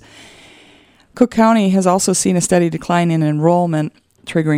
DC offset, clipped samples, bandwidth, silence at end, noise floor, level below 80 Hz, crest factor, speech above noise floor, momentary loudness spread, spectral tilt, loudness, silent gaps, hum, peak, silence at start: under 0.1%; under 0.1%; 15.5 kHz; 0 s; -49 dBFS; -52 dBFS; 16 dB; 34 dB; 9 LU; -5.5 dB/octave; -15 LUFS; none; none; 0 dBFS; 1.15 s